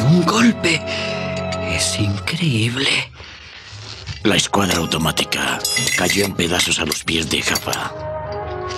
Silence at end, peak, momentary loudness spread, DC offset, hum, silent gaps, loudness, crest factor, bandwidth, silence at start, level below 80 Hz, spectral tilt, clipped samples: 0 s; -2 dBFS; 14 LU; under 0.1%; none; none; -18 LUFS; 16 dB; 16 kHz; 0 s; -44 dBFS; -3.5 dB/octave; under 0.1%